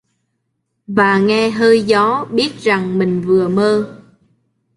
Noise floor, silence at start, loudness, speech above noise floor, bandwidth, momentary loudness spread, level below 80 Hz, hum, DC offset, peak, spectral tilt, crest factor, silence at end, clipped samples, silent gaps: -70 dBFS; 0.9 s; -14 LUFS; 57 dB; 11.5 kHz; 6 LU; -56 dBFS; none; under 0.1%; -2 dBFS; -6 dB/octave; 14 dB; 0.8 s; under 0.1%; none